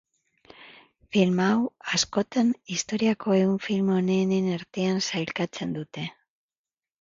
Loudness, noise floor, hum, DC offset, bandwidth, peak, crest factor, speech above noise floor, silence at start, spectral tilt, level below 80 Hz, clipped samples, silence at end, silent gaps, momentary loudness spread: -25 LUFS; under -90 dBFS; none; under 0.1%; 7.8 kHz; -8 dBFS; 20 dB; over 65 dB; 0.6 s; -5 dB/octave; -64 dBFS; under 0.1%; 0.9 s; none; 9 LU